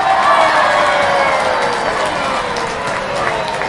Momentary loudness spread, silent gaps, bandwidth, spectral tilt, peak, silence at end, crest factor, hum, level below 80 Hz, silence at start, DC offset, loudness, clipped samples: 8 LU; none; 11.5 kHz; -3 dB/octave; 0 dBFS; 0 s; 14 dB; none; -44 dBFS; 0 s; under 0.1%; -14 LUFS; under 0.1%